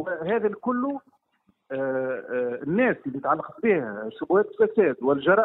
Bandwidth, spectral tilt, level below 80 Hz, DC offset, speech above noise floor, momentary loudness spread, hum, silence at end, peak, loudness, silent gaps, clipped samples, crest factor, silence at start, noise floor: 4 kHz; -10 dB/octave; -66 dBFS; under 0.1%; 44 dB; 9 LU; none; 0 s; -6 dBFS; -25 LUFS; none; under 0.1%; 18 dB; 0 s; -68 dBFS